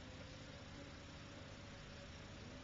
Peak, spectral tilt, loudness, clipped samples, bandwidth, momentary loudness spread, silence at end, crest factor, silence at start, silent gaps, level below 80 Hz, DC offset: -42 dBFS; -4 dB/octave; -55 LUFS; under 0.1%; 7.4 kHz; 1 LU; 0 s; 12 dB; 0 s; none; -64 dBFS; under 0.1%